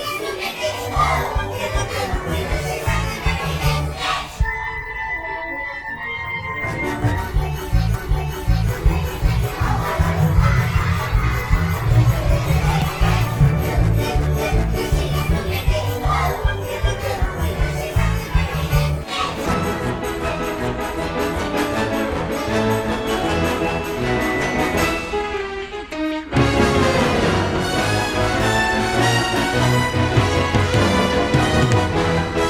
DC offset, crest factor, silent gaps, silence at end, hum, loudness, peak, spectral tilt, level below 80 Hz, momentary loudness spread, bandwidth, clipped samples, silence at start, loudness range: under 0.1%; 16 dB; none; 0 s; none; -20 LUFS; -2 dBFS; -5.5 dB/octave; -26 dBFS; 7 LU; 20 kHz; under 0.1%; 0 s; 5 LU